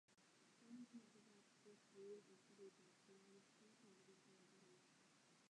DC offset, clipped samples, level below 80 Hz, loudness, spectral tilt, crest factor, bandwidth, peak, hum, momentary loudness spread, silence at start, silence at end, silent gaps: under 0.1%; under 0.1%; under -90 dBFS; -64 LUFS; -4 dB/octave; 18 dB; 10.5 kHz; -50 dBFS; none; 6 LU; 0.1 s; 0 s; none